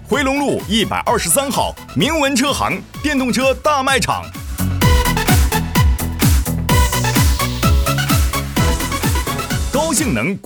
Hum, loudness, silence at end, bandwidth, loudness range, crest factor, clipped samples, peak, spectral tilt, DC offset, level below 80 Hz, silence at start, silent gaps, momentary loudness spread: none; -16 LUFS; 0.05 s; over 20 kHz; 1 LU; 14 dB; under 0.1%; -2 dBFS; -4.5 dB/octave; under 0.1%; -22 dBFS; 0 s; none; 6 LU